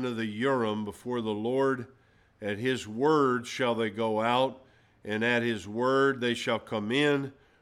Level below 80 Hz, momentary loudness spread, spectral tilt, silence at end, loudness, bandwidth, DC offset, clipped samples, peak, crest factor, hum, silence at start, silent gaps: -70 dBFS; 10 LU; -5.5 dB/octave; 0.3 s; -28 LUFS; 13 kHz; under 0.1%; under 0.1%; -12 dBFS; 18 dB; none; 0 s; none